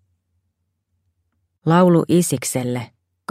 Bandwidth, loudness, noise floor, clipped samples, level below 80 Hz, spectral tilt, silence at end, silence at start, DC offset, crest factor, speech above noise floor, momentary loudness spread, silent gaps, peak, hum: 16 kHz; -17 LUFS; -73 dBFS; under 0.1%; -60 dBFS; -6 dB/octave; 0.45 s; 1.65 s; under 0.1%; 18 dB; 56 dB; 18 LU; none; -2 dBFS; none